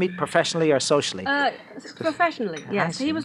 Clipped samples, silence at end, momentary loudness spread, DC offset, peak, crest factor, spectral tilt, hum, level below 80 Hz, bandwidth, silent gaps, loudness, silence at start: under 0.1%; 0 s; 9 LU; under 0.1%; -4 dBFS; 20 dB; -4 dB/octave; none; -66 dBFS; 12.5 kHz; none; -23 LUFS; 0 s